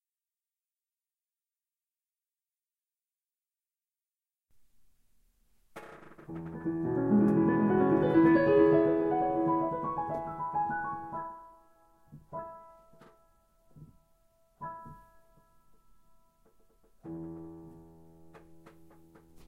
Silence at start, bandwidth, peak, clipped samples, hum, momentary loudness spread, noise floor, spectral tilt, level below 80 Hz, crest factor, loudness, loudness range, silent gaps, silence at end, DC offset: 5.75 s; 4.9 kHz; -12 dBFS; under 0.1%; none; 25 LU; under -90 dBFS; -10 dB/octave; -62 dBFS; 20 dB; -28 LUFS; 24 LU; none; 0.9 s; under 0.1%